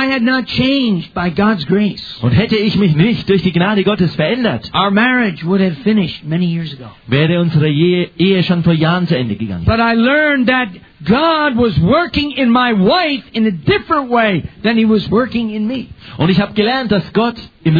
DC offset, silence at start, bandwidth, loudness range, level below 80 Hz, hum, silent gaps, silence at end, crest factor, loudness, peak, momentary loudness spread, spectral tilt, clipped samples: under 0.1%; 0 s; 5 kHz; 2 LU; -38 dBFS; none; none; 0 s; 12 dB; -14 LUFS; 0 dBFS; 7 LU; -8.5 dB/octave; under 0.1%